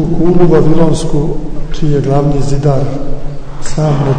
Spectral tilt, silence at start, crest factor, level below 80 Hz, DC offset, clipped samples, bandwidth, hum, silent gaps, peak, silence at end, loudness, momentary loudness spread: -7.5 dB/octave; 0 s; 8 dB; -18 dBFS; under 0.1%; 0.9%; 9.4 kHz; none; none; 0 dBFS; 0 s; -12 LUFS; 15 LU